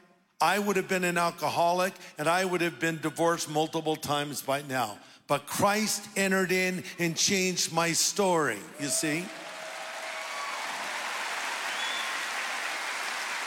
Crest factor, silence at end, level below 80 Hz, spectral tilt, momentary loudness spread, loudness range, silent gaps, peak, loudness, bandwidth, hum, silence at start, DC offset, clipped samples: 18 dB; 0 s; -74 dBFS; -3 dB/octave; 9 LU; 6 LU; none; -12 dBFS; -29 LUFS; 17 kHz; none; 0.4 s; under 0.1%; under 0.1%